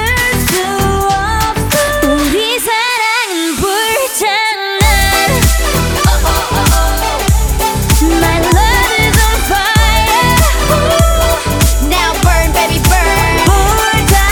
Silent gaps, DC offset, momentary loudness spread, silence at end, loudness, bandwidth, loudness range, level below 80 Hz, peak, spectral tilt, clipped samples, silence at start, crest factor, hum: none; under 0.1%; 3 LU; 0 s; -11 LUFS; over 20 kHz; 2 LU; -16 dBFS; 0 dBFS; -3.5 dB/octave; under 0.1%; 0 s; 10 dB; none